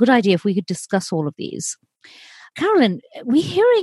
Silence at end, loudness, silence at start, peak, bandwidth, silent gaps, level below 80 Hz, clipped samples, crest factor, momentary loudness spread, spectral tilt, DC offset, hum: 0 s; -20 LUFS; 0 s; -2 dBFS; 12.5 kHz; none; -68 dBFS; under 0.1%; 16 dB; 12 LU; -5 dB/octave; under 0.1%; none